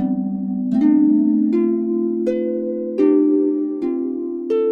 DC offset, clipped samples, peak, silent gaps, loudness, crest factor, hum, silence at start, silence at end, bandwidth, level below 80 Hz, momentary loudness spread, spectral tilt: under 0.1%; under 0.1%; -4 dBFS; none; -18 LUFS; 12 dB; none; 0 s; 0 s; 3.9 kHz; -62 dBFS; 8 LU; -10.5 dB/octave